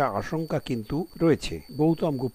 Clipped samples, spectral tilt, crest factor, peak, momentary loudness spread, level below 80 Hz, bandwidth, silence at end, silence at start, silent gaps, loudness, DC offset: under 0.1%; -7 dB/octave; 16 dB; -10 dBFS; 6 LU; -48 dBFS; 15 kHz; 0.05 s; 0 s; none; -27 LUFS; under 0.1%